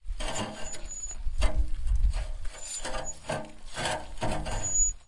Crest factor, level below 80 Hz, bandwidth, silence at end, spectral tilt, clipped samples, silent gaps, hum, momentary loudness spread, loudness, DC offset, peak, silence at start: 18 dB; -32 dBFS; 11.5 kHz; 0.05 s; -2.5 dB/octave; under 0.1%; none; none; 9 LU; -33 LUFS; 0.2%; -10 dBFS; 0.05 s